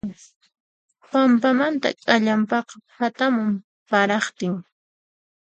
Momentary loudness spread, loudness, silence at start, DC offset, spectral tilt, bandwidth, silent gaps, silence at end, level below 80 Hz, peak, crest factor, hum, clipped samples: 11 LU; -21 LUFS; 0.05 s; under 0.1%; -5 dB/octave; 8.8 kHz; 0.36-0.40 s, 0.60-0.89 s, 3.64-3.86 s; 0.8 s; -66 dBFS; -2 dBFS; 20 dB; none; under 0.1%